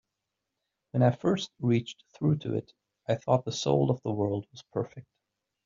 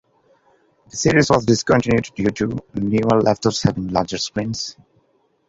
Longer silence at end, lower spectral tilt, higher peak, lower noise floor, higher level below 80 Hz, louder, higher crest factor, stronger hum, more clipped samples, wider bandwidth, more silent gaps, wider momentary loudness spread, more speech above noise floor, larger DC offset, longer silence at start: about the same, 0.65 s vs 0.75 s; first, -7 dB/octave vs -5 dB/octave; second, -10 dBFS vs 0 dBFS; first, -85 dBFS vs -62 dBFS; second, -66 dBFS vs -46 dBFS; second, -29 LUFS vs -19 LUFS; about the same, 20 dB vs 20 dB; neither; neither; about the same, 7.4 kHz vs 8 kHz; neither; about the same, 10 LU vs 9 LU; first, 57 dB vs 44 dB; neither; about the same, 0.95 s vs 0.95 s